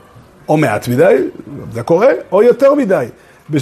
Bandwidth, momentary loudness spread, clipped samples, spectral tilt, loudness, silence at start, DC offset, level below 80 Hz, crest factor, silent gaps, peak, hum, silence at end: 13.5 kHz; 16 LU; under 0.1%; -7 dB/octave; -12 LUFS; 0.5 s; under 0.1%; -52 dBFS; 12 dB; none; 0 dBFS; none; 0 s